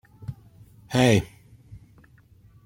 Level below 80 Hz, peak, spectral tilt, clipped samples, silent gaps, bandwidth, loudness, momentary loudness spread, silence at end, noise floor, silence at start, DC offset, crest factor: -52 dBFS; -6 dBFS; -5.5 dB/octave; under 0.1%; none; 16.5 kHz; -22 LUFS; 21 LU; 1.4 s; -55 dBFS; 0.2 s; under 0.1%; 22 dB